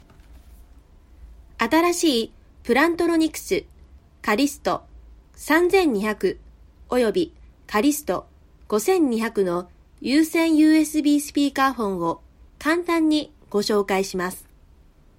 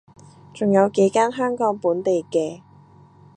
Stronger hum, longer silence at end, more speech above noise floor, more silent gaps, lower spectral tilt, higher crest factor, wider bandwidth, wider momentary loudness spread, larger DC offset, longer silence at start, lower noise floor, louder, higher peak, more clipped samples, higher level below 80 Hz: neither; about the same, 0.8 s vs 0.8 s; about the same, 32 dB vs 30 dB; neither; second, -4 dB/octave vs -6 dB/octave; about the same, 16 dB vs 16 dB; first, 16.5 kHz vs 9.4 kHz; first, 11 LU vs 7 LU; neither; second, 0.3 s vs 0.55 s; about the same, -52 dBFS vs -49 dBFS; about the same, -22 LUFS vs -20 LUFS; about the same, -6 dBFS vs -6 dBFS; neither; first, -50 dBFS vs -66 dBFS